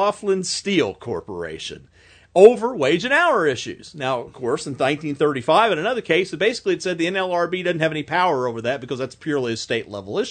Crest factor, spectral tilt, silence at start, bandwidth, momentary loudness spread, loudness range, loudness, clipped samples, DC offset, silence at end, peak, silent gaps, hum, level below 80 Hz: 20 dB; -4.5 dB/octave; 0 s; 9.4 kHz; 12 LU; 4 LU; -20 LUFS; under 0.1%; under 0.1%; 0 s; 0 dBFS; none; none; -60 dBFS